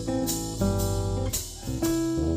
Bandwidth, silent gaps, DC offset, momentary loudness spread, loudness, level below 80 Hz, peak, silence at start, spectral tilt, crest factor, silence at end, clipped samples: 16 kHz; none; under 0.1%; 4 LU; -28 LUFS; -36 dBFS; -14 dBFS; 0 s; -5.5 dB/octave; 14 dB; 0 s; under 0.1%